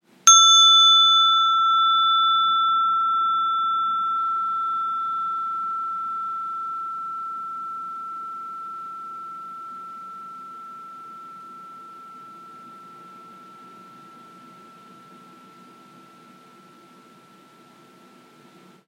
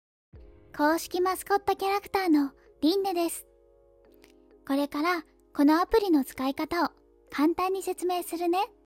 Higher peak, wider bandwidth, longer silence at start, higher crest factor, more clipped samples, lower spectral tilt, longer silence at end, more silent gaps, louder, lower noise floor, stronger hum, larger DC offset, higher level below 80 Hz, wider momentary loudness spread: first, 0 dBFS vs -12 dBFS; about the same, 15 kHz vs 16.5 kHz; about the same, 0.25 s vs 0.35 s; first, 24 dB vs 16 dB; neither; second, 2.5 dB/octave vs -3.5 dB/octave; first, 5.05 s vs 0.2 s; neither; first, -18 LUFS vs -27 LUFS; second, -51 dBFS vs -60 dBFS; neither; neither; second, under -90 dBFS vs -56 dBFS; first, 28 LU vs 8 LU